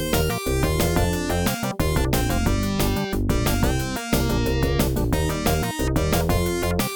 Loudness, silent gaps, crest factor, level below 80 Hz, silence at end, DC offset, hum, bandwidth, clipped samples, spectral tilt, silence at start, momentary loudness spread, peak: -23 LUFS; none; 16 dB; -28 dBFS; 0 s; under 0.1%; none; 19 kHz; under 0.1%; -5 dB/octave; 0 s; 2 LU; -6 dBFS